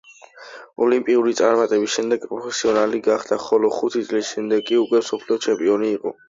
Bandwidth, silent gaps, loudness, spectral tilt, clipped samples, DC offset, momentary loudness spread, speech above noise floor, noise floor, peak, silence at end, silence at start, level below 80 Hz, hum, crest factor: 7.8 kHz; none; -20 LUFS; -3.5 dB/octave; under 0.1%; under 0.1%; 6 LU; 23 dB; -43 dBFS; -2 dBFS; 0.15 s; 0.35 s; -66 dBFS; none; 18 dB